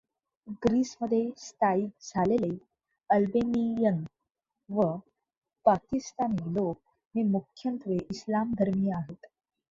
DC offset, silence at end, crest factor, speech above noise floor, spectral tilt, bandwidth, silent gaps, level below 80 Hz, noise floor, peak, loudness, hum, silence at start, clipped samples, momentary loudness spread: under 0.1%; 0.45 s; 20 dB; 57 dB; -7.5 dB/octave; 7.6 kHz; 5.37-5.42 s, 7.07-7.11 s; -60 dBFS; -85 dBFS; -10 dBFS; -29 LUFS; none; 0.45 s; under 0.1%; 10 LU